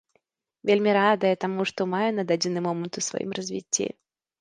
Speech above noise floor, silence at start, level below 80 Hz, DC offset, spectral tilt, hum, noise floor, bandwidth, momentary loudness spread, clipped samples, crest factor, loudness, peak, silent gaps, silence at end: 46 dB; 0.65 s; -72 dBFS; under 0.1%; -4 dB/octave; none; -71 dBFS; 10 kHz; 10 LU; under 0.1%; 18 dB; -25 LUFS; -8 dBFS; none; 0.5 s